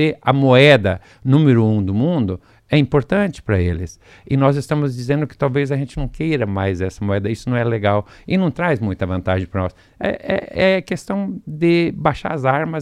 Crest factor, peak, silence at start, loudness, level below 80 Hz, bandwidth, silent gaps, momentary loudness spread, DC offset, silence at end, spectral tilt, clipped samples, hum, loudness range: 18 dB; 0 dBFS; 0 s; -18 LUFS; -40 dBFS; 11 kHz; none; 10 LU; under 0.1%; 0 s; -7.5 dB/octave; under 0.1%; none; 5 LU